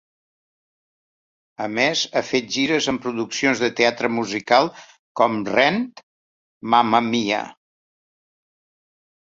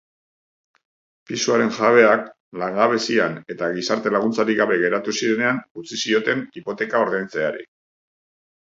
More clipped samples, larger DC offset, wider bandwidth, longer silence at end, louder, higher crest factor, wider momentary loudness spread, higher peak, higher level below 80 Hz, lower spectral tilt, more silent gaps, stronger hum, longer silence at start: neither; neither; about the same, 7.8 kHz vs 7.8 kHz; first, 1.85 s vs 1 s; about the same, -20 LUFS vs -20 LUFS; about the same, 22 dB vs 20 dB; about the same, 9 LU vs 11 LU; about the same, -2 dBFS vs -2 dBFS; first, -62 dBFS vs -70 dBFS; about the same, -3.5 dB/octave vs -4 dB/octave; first, 4.99-5.15 s, 6.03-6.61 s vs 2.40-2.52 s, 5.71-5.75 s; neither; first, 1.6 s vs 1.3 s